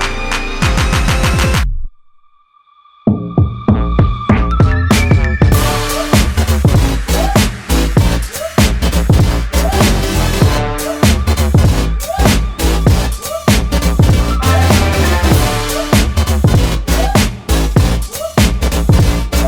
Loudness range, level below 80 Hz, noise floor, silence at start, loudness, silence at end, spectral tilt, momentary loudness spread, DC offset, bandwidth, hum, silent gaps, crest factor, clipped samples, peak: 4 LU; -16 dBFS; -49 dBFS; 0 s; -13 LUFS; 0 s; -5 dB/octave; 5 LU; under 0.1%; 20 kHz; none; none; 12 dB; under 0.1%; 0 dBFS